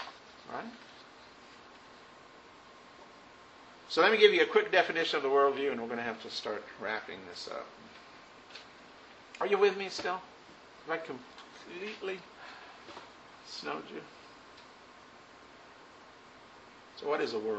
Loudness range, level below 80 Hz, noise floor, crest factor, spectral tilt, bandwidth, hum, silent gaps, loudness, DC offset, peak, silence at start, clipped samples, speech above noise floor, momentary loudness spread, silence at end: 20 LU; -76 dBFS; -55 dBFS; 26 dB; -3.5 dB/octave; 8.2 kHz; none; none; -31 LUFS; under 0.1%; -8 dBFS; 0 s; under 0.1%; 24 dB; 27 LU; 0 s